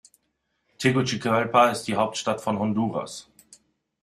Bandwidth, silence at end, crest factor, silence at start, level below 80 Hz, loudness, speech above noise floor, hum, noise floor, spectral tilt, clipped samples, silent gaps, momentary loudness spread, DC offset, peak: 15 kHz; 0.8 s; 22 dB; 0.8 s; -64 dBFS; -24 LUFS; 51 dB; none; -75 dBFS; -5 dB/octave; under 0.1%; none; 10 LU; under 0.1%; -4 dBFS